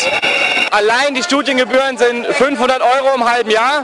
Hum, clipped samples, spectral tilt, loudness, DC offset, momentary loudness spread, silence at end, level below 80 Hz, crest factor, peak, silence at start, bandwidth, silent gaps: none; under 0.1%; -2 dB/octave; -13 LUFS; under 0.1%; 2 LU; 0 s; -54 dBFS; 12 dB; -2 dBFS; 0 s; 12 kHz; none